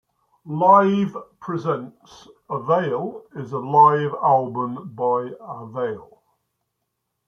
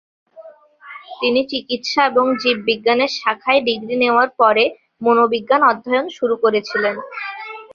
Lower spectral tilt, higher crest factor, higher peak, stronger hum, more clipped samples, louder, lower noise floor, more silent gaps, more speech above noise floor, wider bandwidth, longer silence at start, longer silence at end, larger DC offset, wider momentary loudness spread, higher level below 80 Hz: first, -8.5 dB/octave vs -4 dB/octave; about the same, 20 dB vs 16 dB; about the same, -2 dBFS vs -2 dBFS; neither; neither; second, -20 LUFS vs -17 LUFS; first, -77 dBFS vs -42 dBFS; neither; first, 57 dB vs 25 dB; about the same, 6.8 kHz vs 7.2 kHz; about the same, 0.45 s vs 0.35 s; first, 1.25 s vs 0.1 s; neither; first, 18 LU vs 13 LU; about the same, -68 dBFS vs -66 dBFS